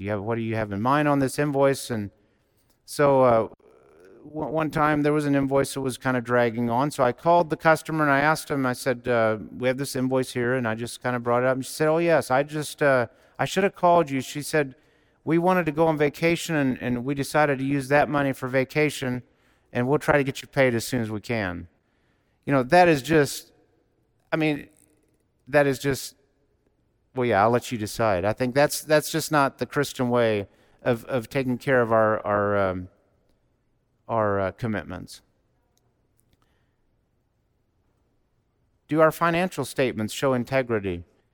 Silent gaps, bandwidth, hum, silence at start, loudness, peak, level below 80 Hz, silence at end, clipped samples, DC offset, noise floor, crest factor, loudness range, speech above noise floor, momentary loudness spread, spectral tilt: none; 19 kHz; none; 0 s; -24 LUFS; -6 dBFS; -56 dBFS; 0.3 s; under 0.1%; under 0.1%; -70 dBFS; 20 dB; 5 LU; 47 dB; 10 LU; -5.5 dB/octave